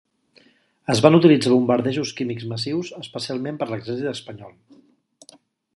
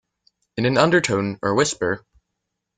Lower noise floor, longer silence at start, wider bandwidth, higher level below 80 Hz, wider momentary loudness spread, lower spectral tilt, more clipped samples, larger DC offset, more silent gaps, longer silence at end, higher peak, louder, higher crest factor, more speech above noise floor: second, -57 dBFS vs -79 dBFS; first, 0.9 s vs 0.55 s; first, 11.5 kHz vs 9.6 kHz; second, -62 dBFS vs -56 dBFS; first, 18 LU vs 10 LU; first, -6 dB/octave vs -4.5 dB/octave; neither; neither; neither; first, 1.25 s vs 0.8 s; about the same, 0 dBFS vs -2 dBFS; about the same, -20 LUFS vs -20 LUFS; about the same, 22 dB vs 20 dB; second, 37 dB vs 60 dB